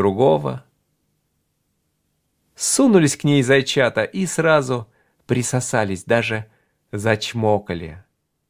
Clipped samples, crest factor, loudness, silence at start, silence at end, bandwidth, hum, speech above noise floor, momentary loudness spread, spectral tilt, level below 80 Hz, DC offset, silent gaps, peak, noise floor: under 0.1%; 20 dB; -19 LUFS; 0 s; 0.5 s; 16 kHz; none; 52 dB; 13 LU; -4.5 dB/octave; -52 dBFS; under 0.1%; none; -2 dBFS; -70 dBFS